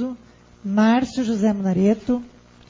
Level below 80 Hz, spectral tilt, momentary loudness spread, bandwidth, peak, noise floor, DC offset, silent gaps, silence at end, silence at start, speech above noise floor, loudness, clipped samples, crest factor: -52 dBFS; -7 dB/octave; 12 LU; 7.6 kHz; -8 dBFS; -47 dBFS; under 0.1%; none; 0.45 s; 0 s; 28 dB; -20 LUFS; under 0.1%; 14 dB